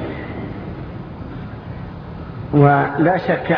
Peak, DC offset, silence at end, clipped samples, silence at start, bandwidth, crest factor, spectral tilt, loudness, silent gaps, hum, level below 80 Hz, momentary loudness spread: 0 dBFS; under 0.1%; 0 s; under 0.1%; 0 s; 5.4 kHz; 20 dB; -10.5 dB/octave; -17 LUFS; none; none; -40 dBFS; 18 LU